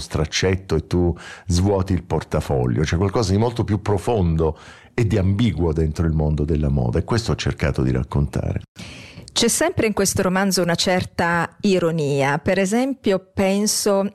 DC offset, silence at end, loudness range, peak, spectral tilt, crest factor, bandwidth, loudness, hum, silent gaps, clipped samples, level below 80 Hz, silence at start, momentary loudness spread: under 0.1%; 0.05 s; 2 LU; -8 dBFS; -5 dB/octave; 12 dB; 15 kHz; -20 LUFS; none; 8.68-8.75 s; under 0.1%; -36 dBFS; 0 s; 5 LU